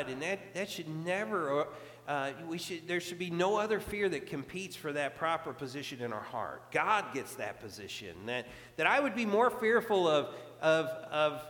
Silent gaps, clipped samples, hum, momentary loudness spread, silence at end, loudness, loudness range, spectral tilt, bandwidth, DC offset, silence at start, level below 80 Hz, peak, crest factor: none; under 0.1%; none; 12 LU; 0 s; -33 LUFS; 5 LU; -4.5 dB/octave; 19 kHz; under 0.1%; 0 s; -68 dBFS; -12 dBFS; 22 dB